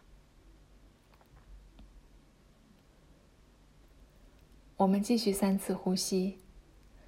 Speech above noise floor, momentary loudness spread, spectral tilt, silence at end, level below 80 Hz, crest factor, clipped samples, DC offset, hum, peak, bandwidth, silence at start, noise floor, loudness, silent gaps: 32 dB; 6 LU; -5.5 dB/octave; 0.5 s; -60 dBFS; 20 dB; under 0.1%; under 0.1%; none; -16 dBFS; 16 kHz; 1.5 s; -62 dBFS; -31 LUFS; none